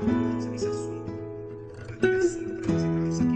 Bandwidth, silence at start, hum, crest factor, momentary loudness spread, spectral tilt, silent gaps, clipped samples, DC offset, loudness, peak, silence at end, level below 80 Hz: 9 kHz; 0 s; none; 18 dB; 14 LU; -7 dB/octave; none; under 0.1%; under 0.1%; -28 LUFS; -10 dBFS; 0 s; -52 dBFS